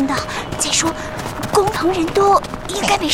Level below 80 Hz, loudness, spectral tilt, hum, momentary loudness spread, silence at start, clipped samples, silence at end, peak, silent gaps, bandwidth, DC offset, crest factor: -38 dBFS; -18 LUFS; -3 dB/octave; none; 10 LU; 0 s; under 0.1%; 0 s; -2 dBFS; none; 19 kHz; 0.2%; 16 dB